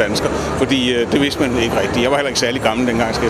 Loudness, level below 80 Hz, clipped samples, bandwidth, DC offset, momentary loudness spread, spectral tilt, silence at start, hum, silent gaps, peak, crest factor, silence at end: -16 LUFS; -36 dBFS; under 0.1%; 15 kHz; under 0.1%; 2 LU; -4.5 dB/octave; 0 s; none; none; 0 dBFS; 16 dB; 0 s